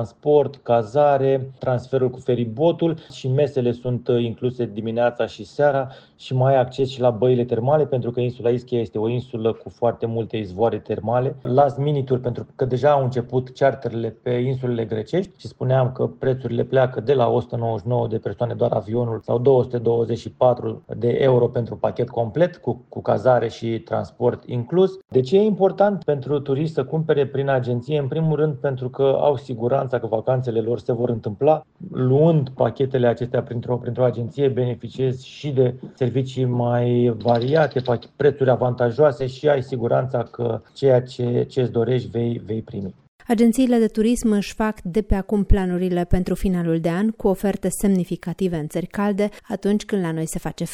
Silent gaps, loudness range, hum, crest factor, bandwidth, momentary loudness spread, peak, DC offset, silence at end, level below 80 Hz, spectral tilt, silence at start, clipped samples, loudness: 43.08-43.19 s; 2 LU; none; 16 dB; 14.5 kHz; 8 LU; -4 dBFS; under 0.1%; 0 s; -40 dBFS; -7.5 dB/octave; 0 s; under 0.1%; -21 LUFS